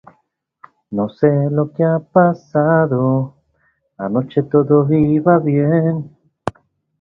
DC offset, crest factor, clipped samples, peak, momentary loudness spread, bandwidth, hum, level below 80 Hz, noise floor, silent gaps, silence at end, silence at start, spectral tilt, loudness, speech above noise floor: under 0.1%; 16 dB; under 0.1%; 0 dBFS; 15 LU; 5.6 kHz; none; -52 dBFS; -65 dBFS; none; 0.5 s; 0.9 s; -10.5 dB/octave; -16 LUFS; 50 dB